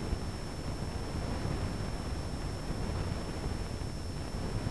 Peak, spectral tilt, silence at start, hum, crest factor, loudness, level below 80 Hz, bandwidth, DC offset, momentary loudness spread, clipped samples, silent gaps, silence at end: -18 dBFS; -6 dB/octave; 0 s; none; 18 dB; -38 LUFS; -40 dBFS; 11 kHz; 0.5%; 3 LU; under 0.1%; none; 0 s